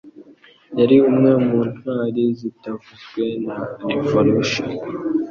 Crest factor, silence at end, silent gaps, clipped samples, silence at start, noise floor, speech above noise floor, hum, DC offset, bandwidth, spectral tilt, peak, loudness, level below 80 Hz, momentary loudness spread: 18 dB; 0 s; none; under 0.1%; 0.05 s; -49 dBFS; 30 dB; none; under 0.1%; 7.2 kHz; -7 dB/octave; -2 dBFS; -19 LUFS; -56 dBFS; 15 LU